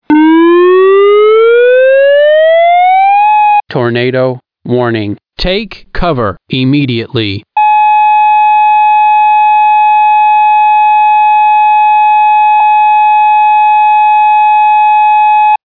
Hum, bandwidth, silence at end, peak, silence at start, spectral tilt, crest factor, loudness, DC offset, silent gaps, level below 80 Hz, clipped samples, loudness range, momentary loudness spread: none; 5.2 kHz; 0.1 s; 0 dBFS; 0.1 s; -8.5 dB/octave; 6 dB; -7 LUFS; 1%; none; -32 dBFS; under 0.1%; 7 LU; 8 LU